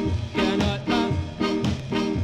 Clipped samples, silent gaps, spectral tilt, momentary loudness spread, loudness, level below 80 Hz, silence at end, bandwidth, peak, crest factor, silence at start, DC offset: under 0.1%; none; -6.5 dB/octave; 3 LU; -25 LUFS; -40 dBFS; 0 s; 12 kHz; -10 dBFS; 14 dB; 0 s; under 0.1%